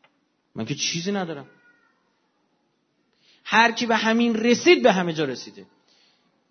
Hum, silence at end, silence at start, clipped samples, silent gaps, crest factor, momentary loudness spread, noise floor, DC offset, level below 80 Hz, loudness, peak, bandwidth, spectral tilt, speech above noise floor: none; 0.85 s; 0.55 s; under 0.1%; none; 22 dB; 20 LU; -70 dBFS; under 0.1%; -74 dBFS; -21 LUFS; -2 dBFS; 6.6 kHz; -4 dB/octave; 48 dB